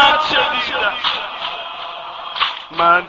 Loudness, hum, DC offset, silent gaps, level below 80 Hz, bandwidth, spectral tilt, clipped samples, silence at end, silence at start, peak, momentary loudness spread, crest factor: -18 LUFS; none; under 0.1%; none; -50 dBFS; 7.6 kHz; 1.5 dB/octave; under 0.1%; 0 s; 0 s; 0 dBFS; 13 LU; 18 dB